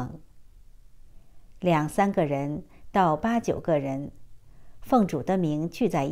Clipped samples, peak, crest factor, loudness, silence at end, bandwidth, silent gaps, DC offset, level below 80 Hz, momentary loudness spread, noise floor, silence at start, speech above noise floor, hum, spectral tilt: under 0.1%; -8 dBFS; 18 dB; -26 LUFS; 0 s; 16 kHz; none; under 0.1%; -52 dBFS; 10 LU; -49 dBFS; 0 s; 24 dB; none; -7 dB/octave